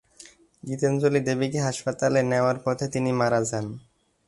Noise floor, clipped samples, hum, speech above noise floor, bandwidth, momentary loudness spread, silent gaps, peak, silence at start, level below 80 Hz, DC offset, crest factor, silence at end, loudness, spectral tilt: -51 dBFS; under 0.1%; none; 27 dB; 11.5 kHz; 12 LU; none; -8 dBFS; 0.2 s; -60 dBFS; under 0.1%; 18 dB; 0.5 s; -25 LUFS; -5.5 dB/octave